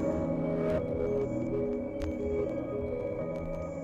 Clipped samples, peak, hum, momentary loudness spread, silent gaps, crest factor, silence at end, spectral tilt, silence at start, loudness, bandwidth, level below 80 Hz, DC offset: under 0.1%; -20 dBFS; none; 5 LU; none; 12 dB; 0 s; -9 dB/octave; 0 s; -33 LUFS; 8.4 kHz; -46 dBFS; under 0.1%